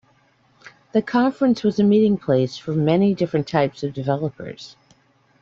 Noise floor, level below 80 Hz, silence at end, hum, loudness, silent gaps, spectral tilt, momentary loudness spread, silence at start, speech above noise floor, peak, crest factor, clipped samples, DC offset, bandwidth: -59 dBFS; -58 dBFS; 0.75 s; none; -20 LUFS; none; -8 dB/octave; 12 LU; 0.95 s; 40 dB; -4 dBFS; 16 dB; under 0.1%; under 0.1%; 7.4 kHz